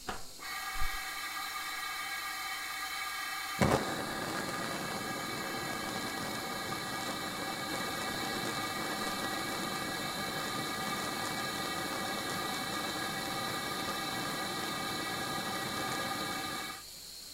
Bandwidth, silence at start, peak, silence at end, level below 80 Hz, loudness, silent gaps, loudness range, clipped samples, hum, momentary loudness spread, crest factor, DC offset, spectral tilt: 16 kHz; 0 s; -10 dBFS; 0 s; -54 dBFS; -36 LUFS; none; 2 LU; under 0.1%; none; 2 LU; 26 dB; under 0.1%; -2.5 dB/octave